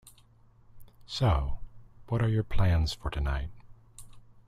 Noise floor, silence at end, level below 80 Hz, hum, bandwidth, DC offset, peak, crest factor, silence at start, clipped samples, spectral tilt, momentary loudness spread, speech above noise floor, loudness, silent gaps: -59 dBFS; 0.3 s; -38 dBFS; none; 13.5 kHz; under 0.1%; -14 dBFS; 18 dB; 0.75 s; under 0.1%; -6.5 dB/octave; 12 LU; 32 dB; -30 LUFS; none